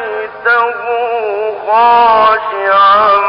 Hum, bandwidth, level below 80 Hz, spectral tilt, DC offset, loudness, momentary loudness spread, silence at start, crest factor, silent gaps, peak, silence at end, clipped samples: none; 5.4 kHz; -50 dBFS; -8 dB/octave; under 0.1%; -10 LUFS; 9 LU; 0 s; 10 dB; none; -2 dBFS; 0 s; under 0.1%